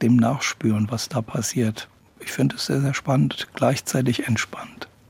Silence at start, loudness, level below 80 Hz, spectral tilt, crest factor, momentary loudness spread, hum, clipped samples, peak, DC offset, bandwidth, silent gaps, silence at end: 0 s; -23 LUFS; -60 dBFS; -5.5 dB/octave; 18 dB; 12 LU; none; under 0.1%; -6 dBFS; under 0.1%; 16.5 kHz; none; 0.25 s